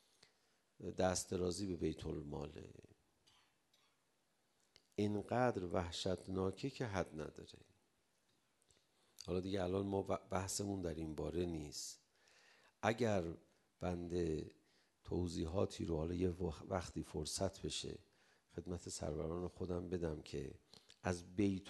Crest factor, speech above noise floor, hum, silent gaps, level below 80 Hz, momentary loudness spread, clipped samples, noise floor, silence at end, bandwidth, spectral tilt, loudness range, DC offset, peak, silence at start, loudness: 26 dB; 40 dB; none; none; -58 dBFS; 12 LU; under 0.1%; -82 dBFS; 0 s; 12 kHz; -5.5 dB/octave; 5 LU; under 0.1%; -18 dBFS; 0.8 s; -43 LUFS